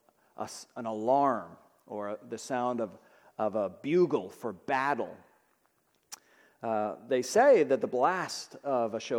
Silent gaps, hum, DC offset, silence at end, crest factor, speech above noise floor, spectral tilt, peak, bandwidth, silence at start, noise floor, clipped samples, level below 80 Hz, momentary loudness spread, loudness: none; none; under 0.1%; 0 s; 18 dB; 43 dB; -5 dB/octave; -14 dBFS; 17.5 kHz; 0.4 s; -72 dBFS; under 0.1%; -82 dBFS; 17 LU; -30 LUFS